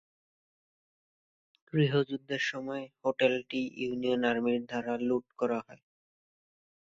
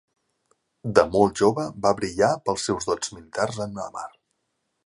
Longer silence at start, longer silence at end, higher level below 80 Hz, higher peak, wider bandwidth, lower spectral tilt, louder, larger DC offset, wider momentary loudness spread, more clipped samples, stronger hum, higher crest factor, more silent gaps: first, 1.75 s vs 0.85 s; first, 1.1 s vs 0.75 s; second, -72 dBFS vs -54 dBFS; second, -12 dBFS vs 0 dBFS; second, 7.6 kHz vs 11.5 kHz; first, -6.5 dB/octave vs -4.5 dB/octave; second, -31 LUFS vs -24 LUFS; neither; second, 7 LU vs 14 LU; neither; neither; about the same, 22 dB vs 24 dB; neither